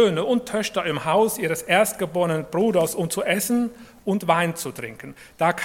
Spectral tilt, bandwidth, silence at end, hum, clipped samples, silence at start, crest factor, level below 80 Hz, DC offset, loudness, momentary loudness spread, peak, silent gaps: -4.5 dB/octave; 17.5 kHz; 0 s; none; under 0.1%; 0 s; 18 dB; -58 dBFS; under 0.1%; -22 LUFS; 11 LU; -4 dBFS; none